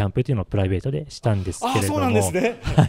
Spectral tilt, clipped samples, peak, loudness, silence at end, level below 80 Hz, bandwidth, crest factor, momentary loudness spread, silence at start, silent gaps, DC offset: -6 dB/octave; under 0.1%; -2 dBFS; -22 LUFS; 0 s; -40 dBFS; 16 kHz; 18 dB; 5 LU; 0 s; none; under 0.1%